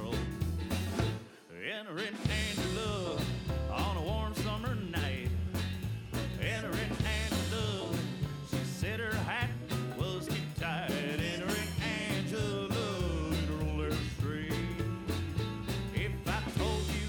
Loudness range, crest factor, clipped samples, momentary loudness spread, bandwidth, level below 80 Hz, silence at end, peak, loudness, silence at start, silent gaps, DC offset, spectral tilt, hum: 1 LU; 18 dB; under 0.1%; 4 LU; over 20 kHz; -44 dBFS; 0 s; -16 dBFS; -35 LUFS; 0 s; none; under 0.1%; -5.5 dB/octave; none